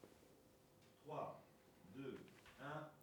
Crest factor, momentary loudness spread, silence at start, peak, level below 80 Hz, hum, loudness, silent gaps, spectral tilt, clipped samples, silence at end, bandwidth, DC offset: 20 dB; 17 LU; 0 s; -36 dBFS; -84 dBFS; none; -55 LUFS; none; -6 dB/octave; under 0.1%; 0 s; over 20 kHz; under 0.1%